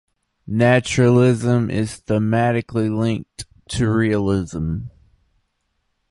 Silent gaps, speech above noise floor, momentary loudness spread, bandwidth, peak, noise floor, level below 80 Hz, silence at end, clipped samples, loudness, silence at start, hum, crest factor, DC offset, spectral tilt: none; 53 dB; 13 LU; 11.5 kHz; -2 dBFS; -71 dBFS; -42 dBFS; 1.2 s; under 0.1%; -19 LUFS; 0.45 s; none; 18 dB; under 0.1%; -6.5 dB/octave